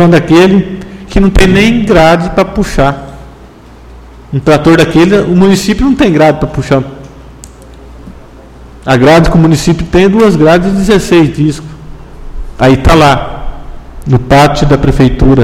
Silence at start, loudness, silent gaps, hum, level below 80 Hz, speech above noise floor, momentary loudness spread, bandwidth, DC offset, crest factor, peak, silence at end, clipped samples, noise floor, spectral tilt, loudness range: 0 s; -7 LUFS; none; none; -20 dBFS; 27 dB; 17 LU; 16 kHz; under 0.1%; 8 dB; 0 dBFS; 0 s; 3%; -33 dBFS; -6.5 dB/octave; 4 LU